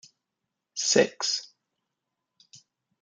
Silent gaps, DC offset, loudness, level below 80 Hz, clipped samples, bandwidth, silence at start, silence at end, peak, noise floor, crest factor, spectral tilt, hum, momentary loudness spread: none; under 0.1%; -25 LUFS; -80 dBFS; under 0.1%; 10 kHz; 0.75 s; 0.45 s; -8 dBFS; -85 dBFS; 24 dB; -1.5 dB/octave; none; 10 LU